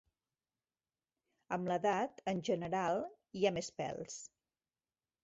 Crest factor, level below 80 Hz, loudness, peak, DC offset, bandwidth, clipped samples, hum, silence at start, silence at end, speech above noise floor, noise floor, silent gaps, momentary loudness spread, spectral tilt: 22 dB; -74 dBFS; -38 LUFS; -18 dBFS; under 0.1%; 8 kHz; under 0.1%; none; 1.5 s; 0.95 s; over 53 dB; under -90 dBFS; none; 12 LU; -4.5 dB/octave